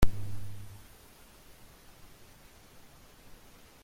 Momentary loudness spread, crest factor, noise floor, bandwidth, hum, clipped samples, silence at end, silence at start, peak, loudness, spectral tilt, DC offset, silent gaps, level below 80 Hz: 13 LU; 24 dB; -56 dBFS; 16.5 kHz; none; under 0.1%; 3.1 s; 0 s; -8 dBFS; -48 LUFS; -6 dB/octave; under 0.1%; none; -42 dBFS